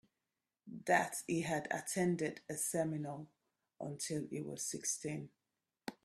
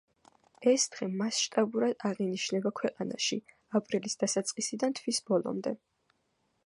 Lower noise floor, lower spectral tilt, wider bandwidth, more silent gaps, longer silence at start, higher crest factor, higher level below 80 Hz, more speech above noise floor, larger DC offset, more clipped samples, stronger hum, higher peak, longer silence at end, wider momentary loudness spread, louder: first, under -90 dBFS vs -76 dBFS; about the same, -4 dB/octave vs -3.5 dB/octave; first, 15.5 kHz vs 11.5 kHz; neither; about the same, 0.65 s vs 0.6 s; about the same, 22 dB vs 18 dB; about the same, -78 dBFS vs -82 dBFS; first, over 51 dB vs 45 dB; neither; neither; neither; second, -18 dBFS vs -14 dBFS; second, 0.1 s vs 0.9 s; first, 17 LU vs 6 LU; second, -39 LUFS vs -31 LUFS